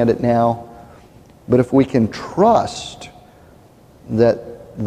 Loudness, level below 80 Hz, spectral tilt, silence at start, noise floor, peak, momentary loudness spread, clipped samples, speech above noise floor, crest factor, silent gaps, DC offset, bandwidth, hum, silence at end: -17 LUFS; -48 dBFS; -7 dB/octave; 0 s; -47 dBFS; -2 dBFS; 20 LU; under 0.1%; 31 dB; 18 dB; none; under 0.1%; 10.5 kHz; none; 0 s